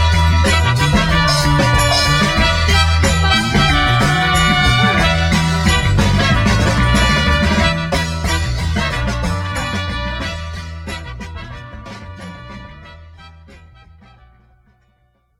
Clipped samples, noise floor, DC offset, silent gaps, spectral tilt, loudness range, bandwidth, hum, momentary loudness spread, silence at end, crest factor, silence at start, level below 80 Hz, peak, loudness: under 0.1%; -59 dBFS; under 0.1%; none; -4.5 dB/octave; 18 LU; 15.5 kHz; none; 18 LU; 2.1 s; 16 dB; 0 s; -24 dBFS; 0 dBFS; -14 LUFS